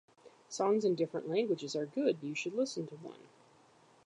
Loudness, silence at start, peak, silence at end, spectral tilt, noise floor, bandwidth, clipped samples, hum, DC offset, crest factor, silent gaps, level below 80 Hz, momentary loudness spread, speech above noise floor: -35 LUFS; 0.25 s; -18 dBFS; 0.8 s; -5 dB/octave; -64 dBFS; 10.5 kHz; under 0.1%; none; under 0.1%; 18 dB; none; -88 dBFS; 15 LU; 30 dB